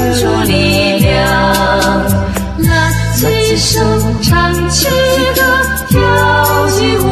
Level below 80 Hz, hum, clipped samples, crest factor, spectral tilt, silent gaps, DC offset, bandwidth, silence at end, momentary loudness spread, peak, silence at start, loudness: -22 dBFS; none; under 0.1%; 10 dB; -4.5 dB/octave; none; under 0.1%; 14.5 kHz; 0 s; 3 LU; 0 dBFS; 0 s; -10 LUFS